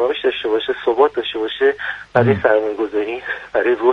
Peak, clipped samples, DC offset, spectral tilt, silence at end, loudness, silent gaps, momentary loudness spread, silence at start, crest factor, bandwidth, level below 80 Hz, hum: 0 dBFS; under 0.1%; under 0.1%; -7.5 dB/octave; 0 s; -18 LUFS; none; 7 LU; 0 s; 16 dB; 6.4 kHz; -54 dBFS; none